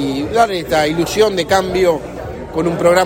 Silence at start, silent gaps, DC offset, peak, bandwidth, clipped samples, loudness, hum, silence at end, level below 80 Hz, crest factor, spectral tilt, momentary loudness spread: 0 s; none; under 0.1%; 0 dBFS; 16.5 kHz; under 0.1%; -15 LUFS; none; 0 s; -38 dBFS; 14 dB; -4.5 dB/octave; 10 LU